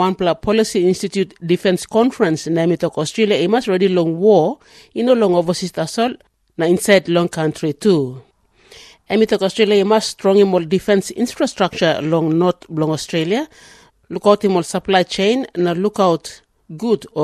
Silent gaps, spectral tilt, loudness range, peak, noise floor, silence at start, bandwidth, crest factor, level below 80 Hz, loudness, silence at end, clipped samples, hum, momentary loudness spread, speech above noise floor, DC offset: none; -5.5 dB/octave; 2 LU; 0 dBFS; -48 dBFS; 0 s; 13.5 kHz; 16 dB; -54 dBFS; -17 LUFS; 0 s; under 0.1%; none; 8 LU; 32 dB; under 0.1%